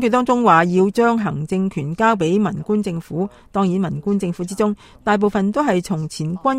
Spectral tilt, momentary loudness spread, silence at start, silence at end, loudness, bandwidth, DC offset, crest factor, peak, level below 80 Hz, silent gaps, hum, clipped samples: -6.5 dB/octave; 11 LU; 0 s; 0 s; -19 LUFS; 13.5 kHz; under 0.1%; 18 dB; 0 dBFS; -50 dBFS; none; none; under 0.1%